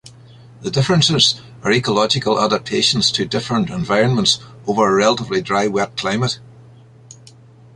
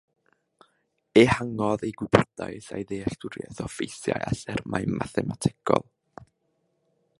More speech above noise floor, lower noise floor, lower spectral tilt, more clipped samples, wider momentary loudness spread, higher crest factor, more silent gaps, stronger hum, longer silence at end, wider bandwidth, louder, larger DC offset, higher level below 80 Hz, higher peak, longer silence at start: second, 27 dB vs 48 dB; second, -44 dBFS vs -73 dBFS; second, -4 dB/octave vs -6 dB/octave; neither; second, 7 LU vs 15 LU; second, 18 dB vs 26 dB; neither; neither; first, 1.25 s vs 0.95 s; about the same, 11.5 kHz vs 11.5 kHz; first, -16 LUFS vs -26 LUFS; neither; about the same, -50 dBFS vs -52 dBFS; about the same, -2 dBFS vs -2 dBFS; second, 0.05 s vs 1.15 s